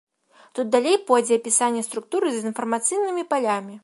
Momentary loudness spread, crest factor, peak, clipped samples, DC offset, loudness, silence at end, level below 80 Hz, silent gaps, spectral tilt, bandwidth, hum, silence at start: 8 LU; 18 dB; -4 dBFS; under 0.1%; under 0.1%; -22 LUFS; 0.05 s; -80 dBFS; none; -2.5 dB/octave; 11.5 kHz; none; 0.55 s